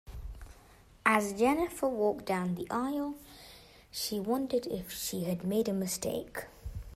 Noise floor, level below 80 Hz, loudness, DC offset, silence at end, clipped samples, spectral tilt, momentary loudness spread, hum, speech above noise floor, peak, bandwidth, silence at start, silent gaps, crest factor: -58 dBFS; -52 dBFS; -32 LUFS; under 0.1%; 0 s; under 0.1%; -4.5 dB/octave; 19 LU; none; 26 dB; -10 dBFS; 16 kHz; 0.05 s; none; 22 dB